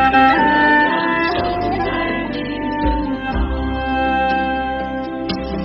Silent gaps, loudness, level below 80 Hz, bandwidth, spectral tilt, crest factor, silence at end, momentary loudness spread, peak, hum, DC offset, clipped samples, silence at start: none; -17 LUFS; -30 dBFS; 6.6 kHz; -7.5 dB/octave; 16 dB; 0 s; 11 LU; -2 dBFS; none; under 0.1%; under 0.1%; 0 s